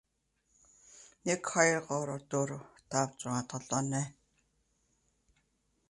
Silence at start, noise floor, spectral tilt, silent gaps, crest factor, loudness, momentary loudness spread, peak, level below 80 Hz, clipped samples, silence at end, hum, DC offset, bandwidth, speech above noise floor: 0.95 s; -78 dBFS; -4 dB/octave; none; 26 dB; -33 LUFS; 10 LU; -12 dBFS; -72 dBFS; under 0.1%; 1.8 s; none; under 0.1%; 11.5 kHz; 45 dB